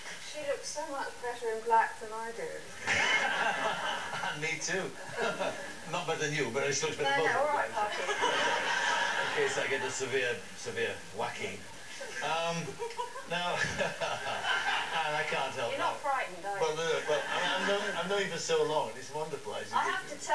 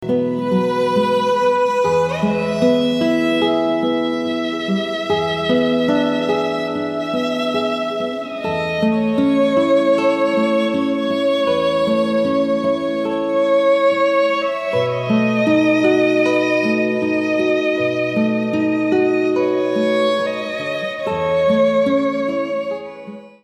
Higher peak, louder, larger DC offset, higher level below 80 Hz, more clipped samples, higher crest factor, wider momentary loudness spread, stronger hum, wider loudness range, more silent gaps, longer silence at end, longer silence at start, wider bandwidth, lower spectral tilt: second, -16 dBFS vs -2 dBFS; second, -32 LUFS vs -17 LUFS; first, 0.4% vs under 0.1%; second, -70 dBFS vs -56 dBFS; neither; about the same, 16 dB vs 14 dB; first, 10 LU vs 7 LU; neither; about the same, 5 LU vs 3 LU; neither; second, 0 s vs 0.15 s; about the same, 0 s vs 0 s; about the same, 11 kHz vs 12 kHz; second, -2.5 dB/octave vs -6 dB/octave